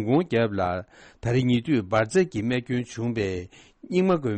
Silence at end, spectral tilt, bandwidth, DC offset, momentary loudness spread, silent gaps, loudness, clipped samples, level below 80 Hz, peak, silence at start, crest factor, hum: 0 s; -7 dB/octave; 8.4 kHz; under 0.1%; 9 LU; none; -25 LUFS; under 0.1%; -54 dBFS; -10 dBFS; 0 s; 14 dB; none